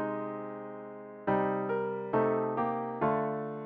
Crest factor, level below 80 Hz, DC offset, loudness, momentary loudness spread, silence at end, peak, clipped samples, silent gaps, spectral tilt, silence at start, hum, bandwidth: 16 dB; -68 dBFS; under 0.1%; -32 LUFS; 13 LU; 0 s; -16 dBFS; under 0.1%; none; -7 dB/octave; 0 s; none; 4.4 kHz